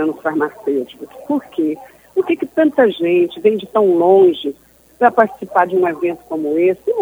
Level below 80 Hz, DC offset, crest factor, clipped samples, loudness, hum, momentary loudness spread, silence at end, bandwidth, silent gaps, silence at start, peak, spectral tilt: -62 dBFS; under 0.1%; 16 dB; under 0.1%; -16 LUFS; none; 11 LU; 0 s; over 20 kHz; none; 0 s; 0 dBFS; -7 dB/octave